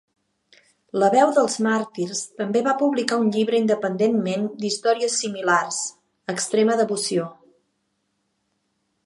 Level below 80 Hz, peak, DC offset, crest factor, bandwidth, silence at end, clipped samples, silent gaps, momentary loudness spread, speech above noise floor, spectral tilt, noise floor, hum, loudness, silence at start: -76 dBFS; -2 dBFS; under 0.1%; 22 dB; 11.5 kHz; 1.7 s; under 0.1%; none; 9 LU; 52 dB; -4 dB/octave; -73 dBFS; none; -22 LUFS; 0.95 s